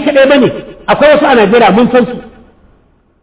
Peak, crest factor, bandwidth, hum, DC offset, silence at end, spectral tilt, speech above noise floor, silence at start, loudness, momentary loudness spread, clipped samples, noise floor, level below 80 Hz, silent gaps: 0 dBFS; 8 dB; 4 kHz; none; under 0.1%; 0.95 s; -9.5 dB/octave; 42 dB; 0 s; -7 LUFS; 11 LU; 0.1%; -49 dBFS; -40 dBFS; none